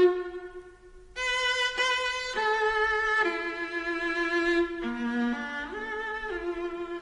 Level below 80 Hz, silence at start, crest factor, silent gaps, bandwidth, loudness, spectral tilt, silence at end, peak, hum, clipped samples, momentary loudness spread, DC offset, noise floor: -54 dBFS; 0 s; 18 dB; none; 10.5 kHz; -28 LUFS; -2.5 dB/octave; 0 s; -12 dBFS; none; under 0.1%; 9 LU; under 0.1%; -50 dBFS